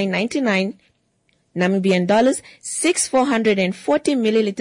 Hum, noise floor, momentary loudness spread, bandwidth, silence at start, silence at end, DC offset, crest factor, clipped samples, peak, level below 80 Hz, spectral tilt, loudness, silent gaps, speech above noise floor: none; -65 dBFS; 7 LU; 11 kHz; 0 s; 0 s; under 0.1%; 12 dB; under 0.1%; -6 dBFS; -62 dBFS; -4.5 dB/octave; -19 LUFS; none; 46 dB